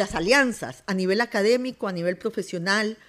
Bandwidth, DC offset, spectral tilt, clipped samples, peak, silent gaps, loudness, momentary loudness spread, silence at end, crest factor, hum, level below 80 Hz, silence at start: 15 kHz; under 0.1%; -4.5 dB/octave; under 0.1%; -6 dBFS; none; -24 LUFS; 10 LU; 0.15 s; 18 dB; none; -54 dBFS; 0 s